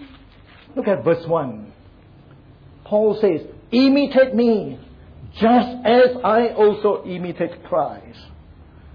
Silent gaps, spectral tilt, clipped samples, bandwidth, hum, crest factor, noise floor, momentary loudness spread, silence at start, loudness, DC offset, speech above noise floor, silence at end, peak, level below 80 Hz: none; -8.5 dB/octave; under 0.1%; 5.2 kHz; none; 14 dB; -46 dBFS; 15 LU; 0 s; -18 LUFS; under 0.1%; 29 dB; 0.05 s; -6 dBFS; -50 dBFS